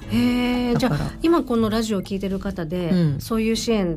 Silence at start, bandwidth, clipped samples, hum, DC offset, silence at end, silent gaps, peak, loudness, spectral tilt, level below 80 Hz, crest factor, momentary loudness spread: 0 s; 15.5 kHz; under 0.1%; none; under 0.1%; 0 s; none; -10 dBFS; -22 LUFS; -6 dB/octave; -38 dBFS; 12 dB; 7 LU